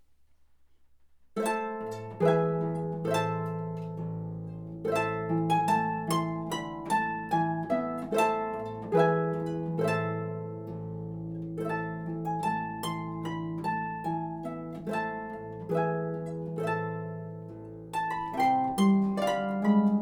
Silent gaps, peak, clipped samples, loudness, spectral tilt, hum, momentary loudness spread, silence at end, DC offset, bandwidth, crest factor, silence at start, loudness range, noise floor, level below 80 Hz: none; -12 dBFS; under 0.1%; -31 LUFS; -6.5 dB/octave; none; 12 LU; 0 s; under 0.1%; 19.5 kHz; 20 dB; 1.35 s; 5 LU; -59 dBFS; -62 dBFS